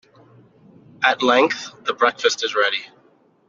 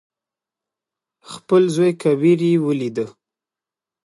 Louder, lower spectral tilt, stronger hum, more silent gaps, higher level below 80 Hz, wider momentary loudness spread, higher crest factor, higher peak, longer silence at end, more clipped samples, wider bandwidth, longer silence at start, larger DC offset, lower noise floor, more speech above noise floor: about the same, -19 LUFS vs -18 LUFS; second, -2 dB/octave vs -7 dB/octave; neither; neither; about the same, -70 dBFS vs -70 dBFS; second, 10 LU vs 16 LU; about the same, 20 dB vs 16 dB; about the same, -2 dBFS vs -4 dBFS; second, 0.6 s vs 0.95 s; neither; second, 7.6 kHz vs 11.5 kHz; second, 1 s vs 1.3 s; neither; second, -57 dBFS vs -89 dBFS; second, 37 dB vs 72 dB